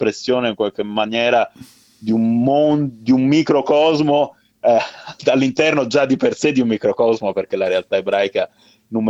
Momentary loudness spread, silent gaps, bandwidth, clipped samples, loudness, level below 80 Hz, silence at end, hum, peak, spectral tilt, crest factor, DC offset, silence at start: 7 LU; none; 8 kHz; under 0.1%; -17 LUFS; -60 dBFS; 0 s; none; -2 dBFS; -6 dB/octave; 16 dB; under 0.1%; 0 s